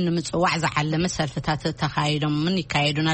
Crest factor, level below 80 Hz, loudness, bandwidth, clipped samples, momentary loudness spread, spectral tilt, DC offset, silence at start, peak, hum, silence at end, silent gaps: 16 dB; -46 dBFS; -23 LUFS; 8.8 kHz; under 0.1%; 4 LU; -5 dB/octave; under 0.1%; 0 s; -6 dBFS; none; 0 s; none